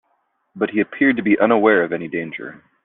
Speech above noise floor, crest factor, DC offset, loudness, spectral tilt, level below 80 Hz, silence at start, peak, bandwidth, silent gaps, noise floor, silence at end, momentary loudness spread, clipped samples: 49 dB; 18 dB; under 0.1%; -18 LUFS; -4.5 dB/octave; -62 dBFS; 0.55 s; -2 dBFS; 4 kHz; none; -67 dBFS; 0.3 s; 15 LU; under 0.1%